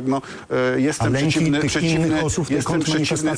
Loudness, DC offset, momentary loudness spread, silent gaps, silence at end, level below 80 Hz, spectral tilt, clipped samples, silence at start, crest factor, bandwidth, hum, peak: -20 LUFS; under 0.1%; 4 LU; none; 0 s; -44 dBFS; -5 dB/octave; under 0.1%; 0 s; 10 dB; 10.5 kHz; none; -10 dBFS